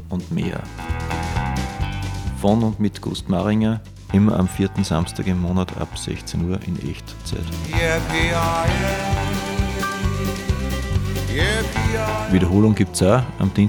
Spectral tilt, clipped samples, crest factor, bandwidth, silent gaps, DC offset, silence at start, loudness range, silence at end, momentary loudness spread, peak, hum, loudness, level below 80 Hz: -6 dB/octave; under 0.1%; 18 dB; 19.5 kHz; none; under 0.1%; 0 s; 4 LU; 0 s; 10 LU; -2 dBFS; none; -21 LUFS; -30 dBFS